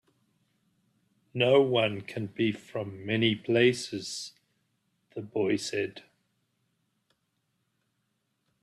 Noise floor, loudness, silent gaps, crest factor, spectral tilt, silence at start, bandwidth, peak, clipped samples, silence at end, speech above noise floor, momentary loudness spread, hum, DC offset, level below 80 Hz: -78 dBFS; -28 LUFS; none; 20 dB; -5 dB/octave; 1.35 s; 12.5 kHz; -10 dBFS; under 0.1%; 2.65 s; 50 dB; 15 LU; none; under 0.1%; -70 dBFS